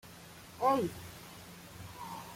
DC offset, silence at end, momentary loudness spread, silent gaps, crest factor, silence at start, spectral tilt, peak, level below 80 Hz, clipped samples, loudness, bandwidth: under 0.1%; 0 s; 20 LU; none; 22 dB; 0.05 s; -5 dB/octave; -16 dBFS; -66 dBFS; under 0.1%; -34 LUFS; 16.5 kHz